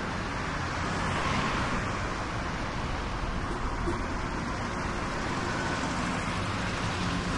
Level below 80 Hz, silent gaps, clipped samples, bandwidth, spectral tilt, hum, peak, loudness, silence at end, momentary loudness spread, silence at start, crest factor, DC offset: -40 dBFS; none; under 0.1%; 11.5 kHz; -5 dB/octave; none; -16 dBFS; -31 LUFS; 0 s; 4 LU; 0 s; 16 dB; under 0.1%